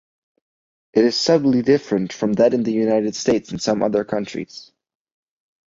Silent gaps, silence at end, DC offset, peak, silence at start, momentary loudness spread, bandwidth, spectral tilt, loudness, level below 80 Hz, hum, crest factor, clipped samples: none; 1.15 s; under 0.1%; -2 dBFS; 0.95 s; 9 LU; 7.8 kHz; -5.5 dB/octave; -19 LUFS; -58 dBFS; none; 18 dB; under 0.1%